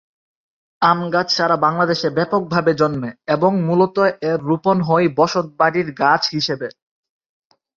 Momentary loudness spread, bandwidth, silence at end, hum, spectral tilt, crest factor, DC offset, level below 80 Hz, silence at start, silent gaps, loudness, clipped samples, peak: 6 LU; 7.4 kHz; 1.05 s; none; -6 dB/octave; 18 dB; under 0.1%; -58 dBFS; 0.8 s; none; -17 LUFS; under 0.1%; 0 dBFS